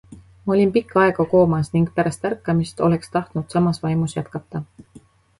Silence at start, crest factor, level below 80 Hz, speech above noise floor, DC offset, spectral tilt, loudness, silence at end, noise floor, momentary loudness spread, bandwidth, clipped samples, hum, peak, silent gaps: 0.1 s; 16 dB; -50 dBFS; 30 dB; under 0.1%; -7.5 dB/octave; -20 LUFS; 0.4 s; -49 dBFS; 13 LU; 11.5 kHz; under 0.1%; none; -4 dBFS; none